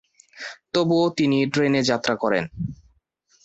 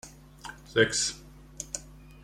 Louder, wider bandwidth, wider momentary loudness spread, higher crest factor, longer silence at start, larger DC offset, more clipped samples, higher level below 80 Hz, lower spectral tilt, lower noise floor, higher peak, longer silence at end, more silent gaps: first, -22 LUFS vs -28 LUFS; second, 8.2 kHz vs 16 kHz; second, 15 LU vs 21 LU; second, 16 dB vs 24 dB; first, 0.35 s vs 0.05 s; neither; neither; about the same, -54 dBFS vs -54 dBFS; first, -5.5 dB/octave vs -2.5 dB/octave; first, -64 dBFS vs -47 dBFS; about the same, -6 dBFS vs -8 dBFS; first, 0.7 s vs 0.1 s; neither